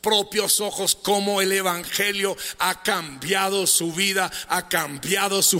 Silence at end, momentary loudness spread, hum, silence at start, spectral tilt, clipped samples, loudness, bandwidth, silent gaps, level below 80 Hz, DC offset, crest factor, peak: 0 s; 6 LU; none; 0.05 s; -1.5 dB/octave; under 0.1%; -21 LUFS; 16 kHz; none; -60 dBFS; under 0.1%; 18 dB; -6 dBFS